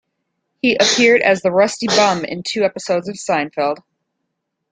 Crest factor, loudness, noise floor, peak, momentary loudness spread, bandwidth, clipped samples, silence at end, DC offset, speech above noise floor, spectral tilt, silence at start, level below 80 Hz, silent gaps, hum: 16 dB; -16 LUFS; -75 dBFS; 0 dBFS; 10 LU; 9.6 kHz; under 0.1%; 0.95 s; under 0.1%; 59 dB; -3 dB/octave; 0.65 s; -60 dBFS; none; none